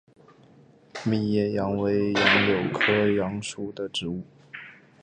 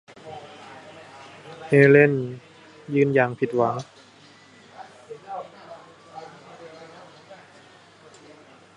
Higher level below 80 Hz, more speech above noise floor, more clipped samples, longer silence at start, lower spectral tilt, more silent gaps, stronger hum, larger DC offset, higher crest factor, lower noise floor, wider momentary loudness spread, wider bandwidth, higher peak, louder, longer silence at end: first, -56 dBFS vs -70 dBFS; about the same, 30 dB vs 32 dB; neither; first, 0.95 s vs 0.25 s; second, -5 dB/octave vs -8 dB/octave; neither; neither; neither; about the same, 22 dB vs 24 dB; first, -55 dBFS vs -51 dBFS; second, 22 LU vs 28 LU; second, 9.4 kHz vs 10.5 kHz; about the same, -4 dBFS vs -2 dBFS; second, -24 LUFS vs -20 LUFS; second, 0.3 s vs 1.4 s